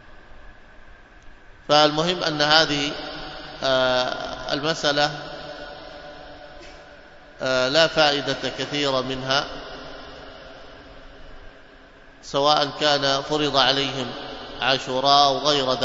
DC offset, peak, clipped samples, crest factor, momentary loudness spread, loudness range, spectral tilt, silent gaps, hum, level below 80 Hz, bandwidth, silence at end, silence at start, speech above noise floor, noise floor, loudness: under 0.1%; 0 dBFS; under 0.1%; 24 dB; 23 LU; 7 LU; -3.5 dB/octave; none; none; -48 dBFS; 7.8 kHz; 0 s; 0.05 s; 26 dB; -47 dBFS; -21 LUFS